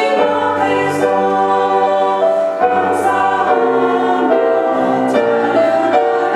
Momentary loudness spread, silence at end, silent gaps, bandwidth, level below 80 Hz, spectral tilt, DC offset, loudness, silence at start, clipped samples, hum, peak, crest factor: 1 LU; 0 s; none; 13 kHz; -62 dBFS; -5.5 dB/octave; under 0.1%; -14 LUFS; 0 s; under 0.1%; none; 0 dBFS; 14 dB